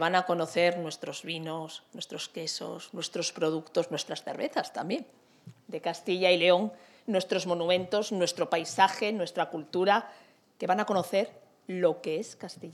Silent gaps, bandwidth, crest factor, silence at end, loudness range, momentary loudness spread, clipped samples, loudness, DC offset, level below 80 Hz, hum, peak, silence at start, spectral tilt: none; 13.5 kHz; 22 dB; 0 s; 6 LU; 13 LU; under 0.1%; -30 LUFS; under 0.1%; -86 dBFS; none; -8 dBFS; 0 s; -4 dB/octave